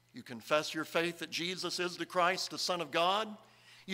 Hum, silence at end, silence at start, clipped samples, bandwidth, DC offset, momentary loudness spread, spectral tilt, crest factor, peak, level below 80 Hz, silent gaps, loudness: none; 0 s; 0.15 s; under 0.1%; 16 kHz; under 0.1%; 14 LU; -3 dB/octave; 20 dB; -14 dBFS; -84 dBFS; none; -34 LUFS